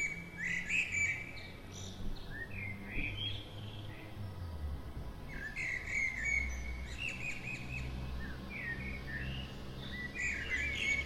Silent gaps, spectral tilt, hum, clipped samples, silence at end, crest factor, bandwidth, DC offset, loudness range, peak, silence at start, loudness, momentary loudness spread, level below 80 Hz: none; -3.5 dB/octave; none; under 0.1%; 0 s; 18 dB; 16 kHz; under 0.1%; 5 LU; -22 dBFS; 0 s; -39 LUFS; 14 LU; -48 dBFS